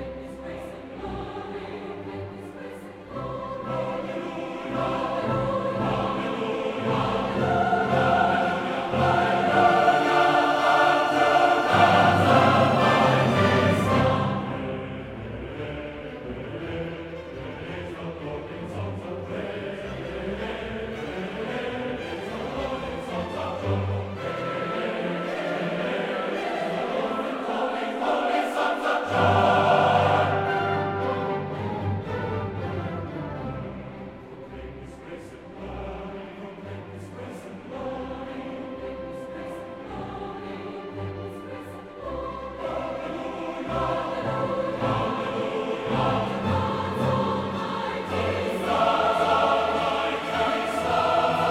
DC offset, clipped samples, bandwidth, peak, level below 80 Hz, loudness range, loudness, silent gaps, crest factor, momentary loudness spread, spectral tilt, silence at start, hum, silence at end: under 0.1%; under 0.1%; 15 kHz; -4 dBFS; -50 dBFS; 16 LU; -25 LUFS; none; 20 dB; 17 LU; -6 dB/octave; 0 s; none; 0 s